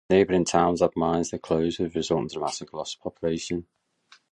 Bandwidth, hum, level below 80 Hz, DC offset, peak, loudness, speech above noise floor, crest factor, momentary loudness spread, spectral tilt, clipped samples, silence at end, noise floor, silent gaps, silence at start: 11 kHz; none; -52 dBFS; under 0.1%; -6 dBFS; -26 LUFS; 34 dB; 20 dB; 12 LU; -5 dB/octave; under 0.1%; 0.7 s; -59 dBFS; none; 0.1 s